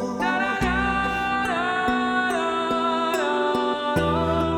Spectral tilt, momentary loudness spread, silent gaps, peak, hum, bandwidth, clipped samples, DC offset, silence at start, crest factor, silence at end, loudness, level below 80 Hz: -5 dB/octave; 1 LU; none; -10 dBFS; none; 17 kHz; under 0.1%; under 0.1%; 0 s; 12 dB; 0 s; -23 LUFS; -40 dBFS